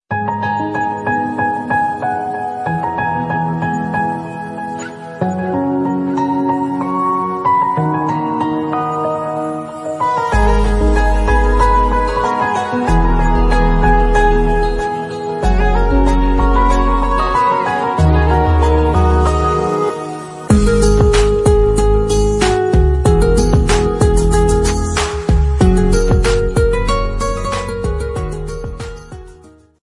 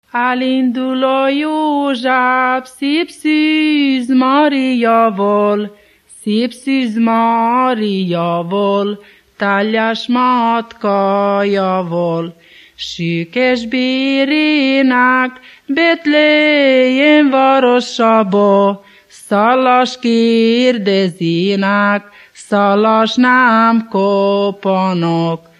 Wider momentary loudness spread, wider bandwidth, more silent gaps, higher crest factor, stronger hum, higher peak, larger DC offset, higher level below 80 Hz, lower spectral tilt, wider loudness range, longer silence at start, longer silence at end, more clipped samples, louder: about the same, 9 LU vs 7 LU; about the same, 11.5 kHz vs 12 kHz; neither; about the same, 12 dB vs 12 dB; neither; about the same, 0 dBFS vs 0 dBFS; neither; first, -18 dBFS vs -62 dBFS; about the same, -6.5 dB/octave vs -6 dB/octave; about the same, 5 LU vs 4 LU; about the same, 0.1 s vs 0.15 s; about the same, 0.35 s vs 0.25 s; neither; about the same, -15 LUFS vs -13 LUFS